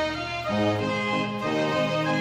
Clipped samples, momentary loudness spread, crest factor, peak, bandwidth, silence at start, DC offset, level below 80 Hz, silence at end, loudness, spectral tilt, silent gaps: under 0.1%; 3 LU; 14 dB; -12 dBFS; 15.5 kHz; 0 s; under 0.1%; -52 dBFS; 0 s; -26 LUFS; -5.5 dB/octave; none